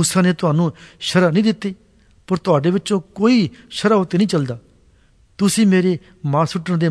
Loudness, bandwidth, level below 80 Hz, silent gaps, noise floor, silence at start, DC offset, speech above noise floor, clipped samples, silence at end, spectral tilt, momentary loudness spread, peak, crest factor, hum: -18 LUFS; 11 kHz; -54 dBFS; none; -53 dBFS; 0 s; under 0.1%; 36 dB; under 0.1%; 0 s; -5.5 dB/octave; 10 LU; -2 dBFS; 16 dB; none